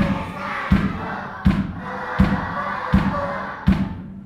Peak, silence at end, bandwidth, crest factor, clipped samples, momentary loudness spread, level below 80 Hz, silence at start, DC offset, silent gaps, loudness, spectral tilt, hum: -2 dBFS; 0 s; 9.2 kHz; 20 dB; under 0.1%; 8 LU; -30 dBFS; 0 s; under 0.1%; none; -22 LUFS; -8 dB/octave; none